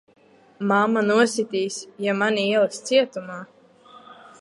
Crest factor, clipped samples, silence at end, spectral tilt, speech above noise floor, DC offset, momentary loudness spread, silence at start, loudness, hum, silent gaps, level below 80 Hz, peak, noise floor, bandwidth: 18 dB; under 0.1%; 0.1 s; -4 dB/octave; 28 dB; under 0.1%; 11 LU; 0.6 s; -22 LUFS; none; none; -76 dBFS; -6 dBFS; -50 dBFS; 11.5 kHz